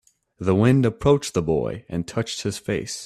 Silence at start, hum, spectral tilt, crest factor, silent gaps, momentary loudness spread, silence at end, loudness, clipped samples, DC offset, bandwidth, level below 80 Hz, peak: 0.4 s; none; -6 dB/octave; 18 dB; none; 10 LU; 0 s; -22 LUFS; under 0.1%; under 0.1%; 13.5 kHz; -48 dBFS; -4 dBFS